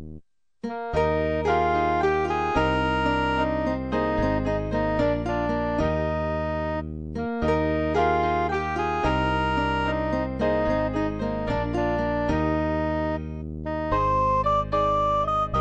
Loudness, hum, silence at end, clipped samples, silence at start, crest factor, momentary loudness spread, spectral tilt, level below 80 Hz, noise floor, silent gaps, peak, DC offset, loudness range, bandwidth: -25 LUFS; none; 0 s; under 0.1%; 0 s; 14 dB; 6 LU; -7.5 dB/octave; -36 dBFS; -48 dBFS; none; -10 dBFS; 0.3%; 2 LU; 8.6 kHz